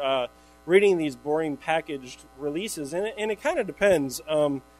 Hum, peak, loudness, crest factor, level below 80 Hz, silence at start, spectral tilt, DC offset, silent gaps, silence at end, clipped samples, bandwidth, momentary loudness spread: none; -6 dBFS; -26 LUFS; 20 dB; -58 dBFS; 0 s; -4.5 dB/octave; under 0.1%; none; 0.2 s; under 0.1%; 16 kHz; 15 LU